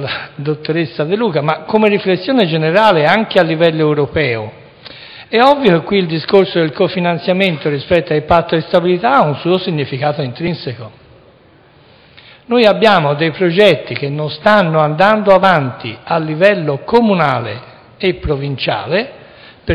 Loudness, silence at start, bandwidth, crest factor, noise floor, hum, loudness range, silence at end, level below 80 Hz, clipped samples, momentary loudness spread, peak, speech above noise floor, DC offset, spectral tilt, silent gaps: -13 LUFS; 0 s; 11 kHz; 14 dB; -46 dBFS; none; 4 LU; 0 s; -42 dBFS; under 0.1%; 11 LU; 0 dBFS; 33 dB; under 0.1%; -7.5 dB/octave; none